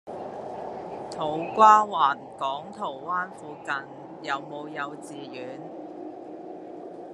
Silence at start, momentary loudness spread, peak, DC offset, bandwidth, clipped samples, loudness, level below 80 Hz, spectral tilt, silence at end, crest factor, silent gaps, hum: 0.05 s; 22 LU; -4 dBFS; under 0.1%; 11 kHz; under 0.1%; -26 LUFS; -72 dBFS; -4.5 dB/octave; 0 s; 24 dB; none; none